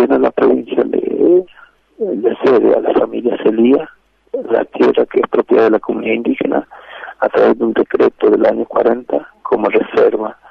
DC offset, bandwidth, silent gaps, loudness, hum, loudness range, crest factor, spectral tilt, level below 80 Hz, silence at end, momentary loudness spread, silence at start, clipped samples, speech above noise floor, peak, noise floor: under 0.1%; 5.8 kHz; none; -14 LUFS; none; 1 LU; 12 dB; -8 dB/octave; -54 dBFS; 0.2 s; 10 LU; 0 s; under 0.1%; 32 dB; 0 dBFS; -45 dBFS